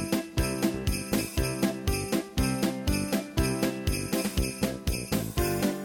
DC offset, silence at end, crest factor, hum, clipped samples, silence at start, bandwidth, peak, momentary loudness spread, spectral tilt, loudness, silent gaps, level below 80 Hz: under 0.1%; 0 s; 16 dB; none; under 0.1%; 0 s; over 20 kHz; -12 dBFS; 3 LU; -5 dB/octave; -29 LUFS; none; -36 dBFS